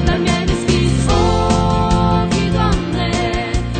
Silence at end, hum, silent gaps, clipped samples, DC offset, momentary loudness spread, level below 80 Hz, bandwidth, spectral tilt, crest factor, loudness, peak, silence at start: 0 s; none; none; under 0.1%; under 0.1%; 4 LU; -22 dBFS; 9.2 kHz; -6 dB/octave; 14 dB; -16 LUFS; -2 dBFS; 0 s